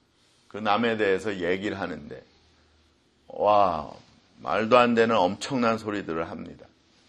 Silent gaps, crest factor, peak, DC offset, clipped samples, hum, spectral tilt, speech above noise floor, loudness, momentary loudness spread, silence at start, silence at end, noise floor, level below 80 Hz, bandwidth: none; 22 dB; -6 dBFS; under 0.1%; under 0.1%; none; -5.5 dB/octave; 39 dB; -25 LUFS; 22 LU; 0.55 s; 0.55 s; -63 dBFS; -60 dBFS; 10 kHz